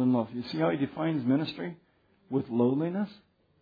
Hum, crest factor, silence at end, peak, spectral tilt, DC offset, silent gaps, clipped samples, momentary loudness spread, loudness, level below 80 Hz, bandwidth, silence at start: none; 16 dB; 0.5 s; -14 dBFS; -9.5 dB/octave; under 0.1%; none; under 0.1%; 9 LU; -30 LUFS; -72 dBFS; 5 kHz; 0 s